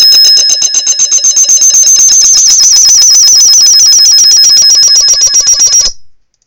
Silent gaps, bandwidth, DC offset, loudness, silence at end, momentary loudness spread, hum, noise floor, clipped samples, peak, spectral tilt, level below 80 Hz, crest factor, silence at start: none; over 20 kHz; under 0.1%; -1 LUFS; 0.4 s; 5 LU; none; -32 dBFS; 10%; 0 dBFS; 4.5 dB/octave; -42 dBFS; 4 dB; 0 s